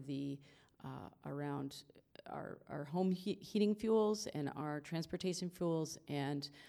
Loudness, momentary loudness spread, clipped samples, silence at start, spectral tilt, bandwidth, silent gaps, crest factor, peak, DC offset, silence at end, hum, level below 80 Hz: -40 LUFS; 16 LU; under 0.1%; 0 s; -6 dB/octave; 15.5 kHz; none; 16 dB; -24 dBFS; under 0.1%; 0 s; none; -74 dBFS